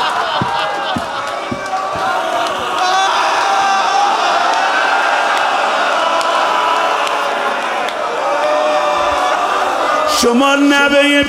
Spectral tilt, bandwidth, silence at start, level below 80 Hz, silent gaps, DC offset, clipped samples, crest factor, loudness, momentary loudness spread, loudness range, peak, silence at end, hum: -2.5 dB/octave; 16.5 kHz; 0 s; -50 dBFS; none; under 0.1%; under 0.1%; 14 dB; -14 LUFS; 7 LU; 2 LU; 0 dBFS; 0 s; none